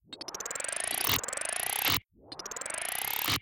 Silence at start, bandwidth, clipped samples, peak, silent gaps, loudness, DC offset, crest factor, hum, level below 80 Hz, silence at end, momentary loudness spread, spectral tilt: 0.1 s; 17.5 kHz; under 0.1%; -12 dBFS; none; -31 LUFS; under 0.1%; 22 dB; none; -60 dBFS; 0 s; 12 LU; -1 dB/octave